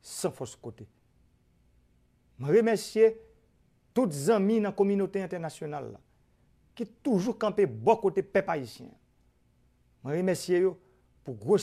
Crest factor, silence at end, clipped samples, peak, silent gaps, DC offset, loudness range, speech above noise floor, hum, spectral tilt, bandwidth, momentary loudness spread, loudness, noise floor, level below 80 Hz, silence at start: 20 dB; 0 s; under 0.1%; -10 dBFS; none; under 0.1%; 4 LU; 39 dB; none; -6 dB/octave; 15 kHz; 19 LU; -28 LUFS; -67 dBFS; -68 dBFS; 0.05 s